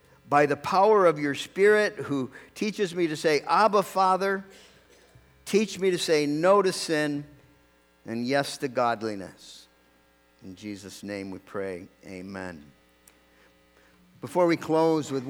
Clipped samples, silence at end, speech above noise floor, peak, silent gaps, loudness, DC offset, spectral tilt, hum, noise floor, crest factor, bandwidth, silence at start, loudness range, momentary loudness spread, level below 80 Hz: under 0.1%; 0 s; 37 dB; -8 dBFS; none; -25 LUFS; under 0.1%; -4.5 dB/octave; none; -62 dBFS; 20 dB; 17.5 kHz; 0.25 s; 15 LU; 18 LU; -68 dBFS